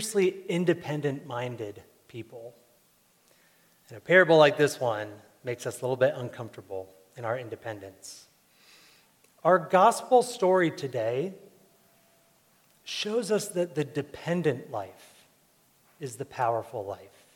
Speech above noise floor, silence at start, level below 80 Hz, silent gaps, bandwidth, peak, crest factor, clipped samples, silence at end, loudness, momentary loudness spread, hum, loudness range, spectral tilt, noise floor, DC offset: 38 dB; 0 s; -76 dBFS; none; 17 kHz; -6 dBFS; 22 dB; under 0.1%; 0.3 s; -27 LUFS; 22 LU; none; 9 LU; -5 dB/octave; -65 dBFS; under 0.1%